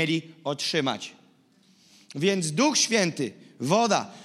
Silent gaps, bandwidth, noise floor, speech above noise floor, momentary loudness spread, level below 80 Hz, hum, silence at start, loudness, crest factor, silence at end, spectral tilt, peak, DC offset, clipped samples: none; 15 kHz; -61 dBFS; 35 dB; 13 LU; -82 dBFS; none; 0 s; -25 LUFS; 20 dB; 0 s; -3.5 dB/octave; -8 dBFS; under 0.1%; under 0.1%